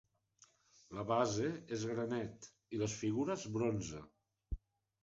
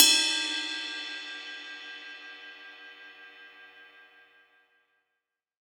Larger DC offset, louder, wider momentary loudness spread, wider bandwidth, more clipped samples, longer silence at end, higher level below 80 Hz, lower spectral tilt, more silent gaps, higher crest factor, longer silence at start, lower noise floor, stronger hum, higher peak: neither; second, -39 LUFS vs -28 LUFS; second, 15 LU vs 24 LU; second, 8 kHz vs over 20 kHz; neither; second, 0.45 s vs 1.85 s; first, -58 dBFS vs under -90 dBFS; first, -6 dB/octave vs 4 dB/octave; neither; second, 20 dB vs 32 dB; first, 0.9 s vs 0 s; second, -70 dBFS vs -85 dBFS; neither; second, -20 dBFS vs 0 dBFS